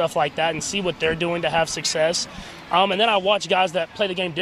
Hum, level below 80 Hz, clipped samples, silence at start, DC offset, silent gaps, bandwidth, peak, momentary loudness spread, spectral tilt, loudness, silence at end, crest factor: none; -52 dBFS; under 0.1%; 0 s; under 0.1%; none; 14 kHz; -4 dBFS; 6 LU; -3 dB/octave; -21 LUFS; 0 s; 18 dB